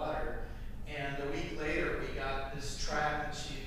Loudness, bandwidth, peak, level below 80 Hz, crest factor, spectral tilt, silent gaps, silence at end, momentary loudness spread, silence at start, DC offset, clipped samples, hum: -37 LUFS; 15 kHz; -22 dBFS; -42 dBFS; 14 dB; -4.5 dB/octave; none; 0 s; 9 LU; 0 s; under 0.1%; under 0.1%; none